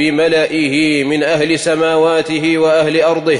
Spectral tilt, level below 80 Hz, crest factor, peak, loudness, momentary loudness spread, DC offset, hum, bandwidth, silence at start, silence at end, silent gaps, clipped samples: -4.5 dB/octave; -54 dBFS; 10 dB; -4 dBFS; -13 LUFS; 2 LU; under 0.1%; none; 11 kHz; 0 s; 0 s; none; under 0.1%